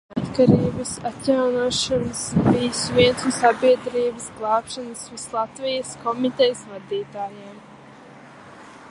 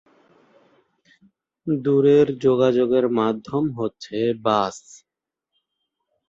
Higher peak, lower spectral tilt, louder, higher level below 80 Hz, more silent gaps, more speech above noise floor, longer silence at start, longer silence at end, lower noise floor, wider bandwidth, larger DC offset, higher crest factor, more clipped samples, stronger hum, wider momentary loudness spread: first, -2 dBFS vs -6 dBFS; second, -5 dB/octave vs -7 dB/octave; about the same, -21 LUFS vs -20 LUFS; first, -50 dBFS vs -62 dBFS; neither; second, 23 dB vs 67 dB; second, 0.1 s vs 1.65 s; second, 0 s vs 1.3 s; second, -44 dBFS vs -86 dBFS; first, 11.5 kHz vs 7.8 kHz; neither; about the same, 20 dB vs 18 dB; neither; neither; about the same, 14 LU vs 12 LU